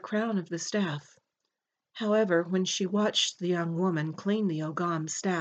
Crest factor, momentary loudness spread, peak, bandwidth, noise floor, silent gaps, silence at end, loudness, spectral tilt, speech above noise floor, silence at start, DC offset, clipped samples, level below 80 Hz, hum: 16 dB; 6 LU; -14 dBFS; 8.8 kHz; -85 dBFS; none; 0 s; -29 LUFS; -4.5 dB/octave; 56 dB; 0.05 s; under 0.1%; under 0.1%; -86 dBFS; none